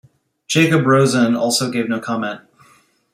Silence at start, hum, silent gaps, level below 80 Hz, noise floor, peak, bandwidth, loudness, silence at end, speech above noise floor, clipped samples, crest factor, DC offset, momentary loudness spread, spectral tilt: 0.5 s; none; none; -60 dBFS; -54 dBFS; -2 dBFS; 16 kHz; -16 LUFS; 0.75 s; 38 dB; under 0.1%; 16 dB; under 0.1%; 10 LU; -5 dB/octave